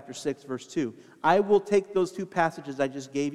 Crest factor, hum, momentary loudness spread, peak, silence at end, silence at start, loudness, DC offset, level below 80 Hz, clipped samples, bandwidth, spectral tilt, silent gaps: 20 dB; none; 11 LU; -6 dBFS; 0 s; 0 s; -27 LUFS; under 0.1%; -70 dBFS; under 0.1%; 12 kHz; -5.5 dB/octave; none